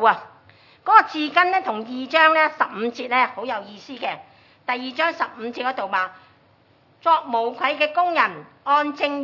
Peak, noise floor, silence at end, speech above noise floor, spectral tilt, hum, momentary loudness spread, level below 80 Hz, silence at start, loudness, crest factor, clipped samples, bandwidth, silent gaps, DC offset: 0 dBFS; -57 dBFS; 0 s; 36 dB; -4 dB/octave; none; 14 LU; -80 dBFS; 0 s; -21 LUFS; 22 dB; under 0.1%; 6 kHz; none; under 0.1%